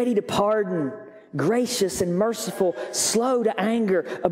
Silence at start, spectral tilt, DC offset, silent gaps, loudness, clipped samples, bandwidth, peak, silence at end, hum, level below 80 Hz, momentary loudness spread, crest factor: 0 s; -4 dB/octave; under 0.1%; none; -23 LUFS; under 0.1%; 16 kHz; -4 dBFS; 0 s; none; -60 dBFS; 6 LU; 20 dB